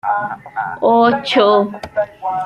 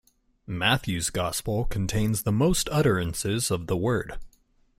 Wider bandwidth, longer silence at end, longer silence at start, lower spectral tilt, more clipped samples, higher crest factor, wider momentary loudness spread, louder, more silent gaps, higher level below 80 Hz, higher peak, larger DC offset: second, 11 kHz vs 16.5 kHz; second, 0 s vs 0.5 s; second, 0.05 s vs 0.5 s; about the same, -5.5 dB/octave vs -4.5 dB/octave; neither; about the same, 14 dB vs 18 dB; first, 12 LU vs 6 LU; first, -16 LUFS vs -26 LUFS; neither; second, -56 dBFS vs -40 dBFS; first, -2 dBFS vs -8 dBFS; neither